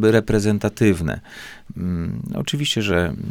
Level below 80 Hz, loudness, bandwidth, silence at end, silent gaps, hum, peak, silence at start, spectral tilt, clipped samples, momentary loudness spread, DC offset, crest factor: -40 dBFS; -21 LUFS; 18 kHz; 0 s; none; none; -4 dBFS; 0 s; -5.5 dB/octave; under 0.1%; 14 LU; under 0.1%; 18 dB